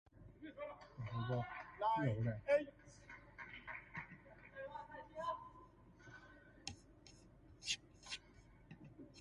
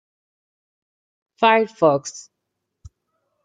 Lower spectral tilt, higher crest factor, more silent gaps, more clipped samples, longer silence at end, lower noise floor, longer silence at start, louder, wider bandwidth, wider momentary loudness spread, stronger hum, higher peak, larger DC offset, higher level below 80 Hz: about the same, -5 dB/octave vs -4 dB/octave; about the same, 22 dB vs 22 dB; neither; neither; second, 0 s vs 1.25 s; second, -65 dBFS vs -79 dBFS; second, 0.15 s vs 1.4 s; second, -45 LUFS vs -18 LUFS; first, 11.5 kHz vs 9.4 kHz; first, 25 LU vs 18 LU; neither; second, -24 dBFS vs -2 dBFS; neither; second, -68 dBFS vs -60 dBFS